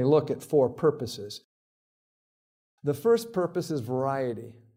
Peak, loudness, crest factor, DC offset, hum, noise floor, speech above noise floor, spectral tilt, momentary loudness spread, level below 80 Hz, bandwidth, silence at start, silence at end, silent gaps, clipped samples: -10 dBFS; -27 LUFS; 18 dB; under 0.1%; none; under -90 dBFS; over 63 dB; -6.5 dB/octave; 14 LU; -70 dBFS; 16.5 kHz; 0 s; 0.25 s; 1.44-2.78 s; under 0.1%